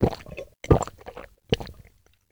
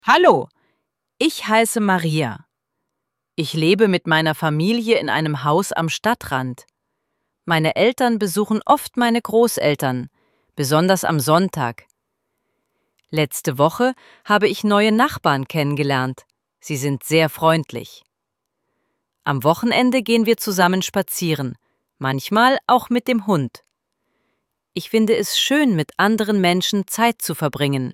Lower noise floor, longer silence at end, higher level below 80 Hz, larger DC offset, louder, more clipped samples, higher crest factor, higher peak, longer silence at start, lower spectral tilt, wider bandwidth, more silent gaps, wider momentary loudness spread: second, -58 dBFS vs -79 dBFS; first, 0.6 s vs 0 s; first, -38 dBFS vs -60 dBFS; neither; second, -26 LUFS vs -18 LUFS; neither; first, 24 dB vs 18 dB; about the same, -4 dBFS vs -2 dBFS; about the same, 0 s vs 0.05 s; first, -6.5 dB/octave vs -5 dB/octave; first, over 20 kHz vs 17 kHz; neither; first, 20 LU vs 11 LU